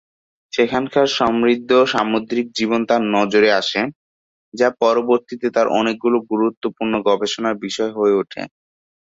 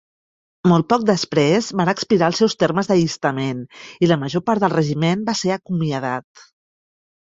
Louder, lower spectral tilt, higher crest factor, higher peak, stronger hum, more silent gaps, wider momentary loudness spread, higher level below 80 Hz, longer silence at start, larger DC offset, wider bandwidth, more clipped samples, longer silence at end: about the same, -18 LUFS vs -19 LUFS; second, -4.5 dB/octave vs -6 dB/octave; about the same, 16 dB vs 18 dB; about the same, -2 dBFS vs -2 dBFS; neither; first, 3.95-4.52 s, 6.57-6.61 s vs none; about the same, 8 LU vs 8 LU; about the same, -58 dBFS vs -58 dBFS; about the same, 0.55 s vs 0.65 s; neither; about the same, 8 kHz vs 7.8 kHz; neither; second, 0.6 s vs 1 s